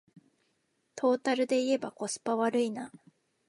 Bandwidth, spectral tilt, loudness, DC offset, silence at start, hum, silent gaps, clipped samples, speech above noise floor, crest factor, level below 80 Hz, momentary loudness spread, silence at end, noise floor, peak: 11.5 kHz; -3.5 dB/octave; -30 LUFS; under 0.1%; 0.95 s; none; none; under 0.1%; 46 dB; 16 dB; -84 dBFS; 13 LU; 0.6 s; -76 dBFS; -16 dBFS